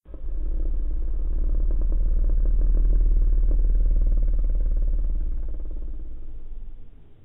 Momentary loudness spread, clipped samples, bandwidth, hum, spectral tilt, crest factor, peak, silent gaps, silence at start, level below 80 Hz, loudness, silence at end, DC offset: 16 LU; under 0.1%; 1.3 kHz; none; -12.5 dB/octave; 10 dB; -10 dBFS; none; 0.1 s; -22 dBFS; -28 LUFS; 0.1 s; under 0.1%